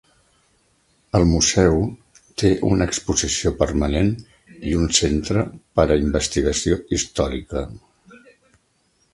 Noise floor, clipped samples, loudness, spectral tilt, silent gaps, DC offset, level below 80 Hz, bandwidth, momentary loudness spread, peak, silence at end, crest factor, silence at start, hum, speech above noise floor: -64 dBFS; under 0.1%; -20 LUFS; -4.5 dB/octave; none; under 0.1%; -32 dBFS; 11.5 kHz; 11 LU; 0 dBFS; 1.35 s; 22 dB; 1.15 s; none; 44 dB